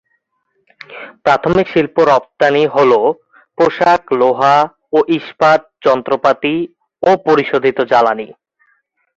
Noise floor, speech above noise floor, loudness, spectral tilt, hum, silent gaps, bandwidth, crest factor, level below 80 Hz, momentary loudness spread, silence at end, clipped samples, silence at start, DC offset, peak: -66 dBFS; 53 dB; -13 LUFS; -6 dB/octave; none; none; 7.8 kHz; 14 dB; -52 dBFS; 10 LU; 0.85 s; under 0.1%; 0.9 s; under 0.1%; 0 dBFS